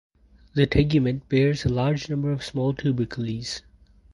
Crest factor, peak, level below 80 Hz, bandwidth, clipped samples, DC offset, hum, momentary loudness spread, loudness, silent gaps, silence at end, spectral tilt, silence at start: 18 dB; -6 dBFS; -42 dBFS; 11.5 kHz; under 0.1%; under 0.1%; none; 10 LU; -24 LUFS; none; 0.55 s; -7 dB/octave; 0.55 s